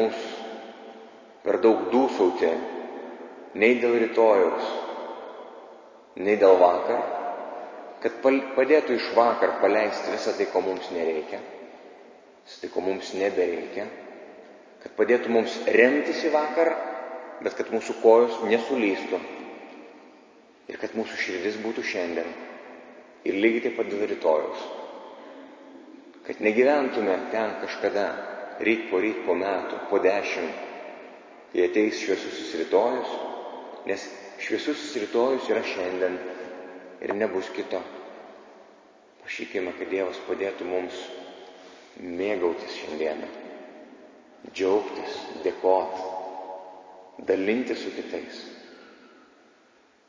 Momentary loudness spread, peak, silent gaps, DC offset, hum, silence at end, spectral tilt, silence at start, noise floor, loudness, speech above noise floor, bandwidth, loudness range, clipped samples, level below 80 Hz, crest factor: 22 LU; -4 dBFS; none; under 0.1%; none; 1.15 s; -4.5 dB/octave; 0 s; -60 dBFS; -25 LUFS; 35 dB; 7.6 kHz; 9 LU; under 0.1%; -70 dBFS; 22 dB